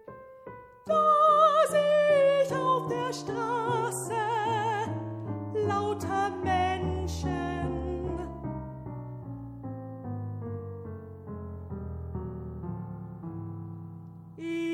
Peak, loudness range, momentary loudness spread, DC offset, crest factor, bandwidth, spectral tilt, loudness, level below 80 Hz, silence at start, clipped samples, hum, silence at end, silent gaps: -10 dBFS; 15 LU; 19 LU; under 0.1%; 18 dB; 15 kHz; -6 dB/octave; -28 LUFS; -48 dBFS; 0.05 s; under 0.1%; none; 0 s; none